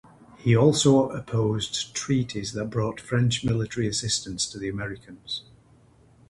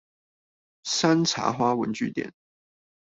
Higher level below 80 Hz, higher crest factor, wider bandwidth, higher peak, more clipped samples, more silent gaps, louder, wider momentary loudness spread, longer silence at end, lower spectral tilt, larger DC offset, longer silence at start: first, -52 dBFS vs -66 dBFS; about the same, 20 dB vs 20 dB; first, 11.5 kHz vs 8.2 kHz; about the same, -6 dBFS vs -8 dBFS; neither; neither; about the same, -25 LUFS vs -25 LUFS; about the same, 14 LU vs 14 LU; first, 0.9 s vs 0.75 s; about the same, -5 dB/octave vs -4 dB/octave; neither; second, 0.4 s vs 0.85 s